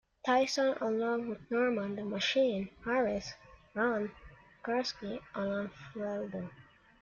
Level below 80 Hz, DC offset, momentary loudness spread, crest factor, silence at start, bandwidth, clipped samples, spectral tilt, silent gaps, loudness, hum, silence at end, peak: -64 dBFS; under 0.1%; 13 LU; 16 dB; 0.25 s; 7.4 kHz; under 0.1%; -4.5 dB/octave; none; -34 LUFS; none; 0.4 s; -18 dBFS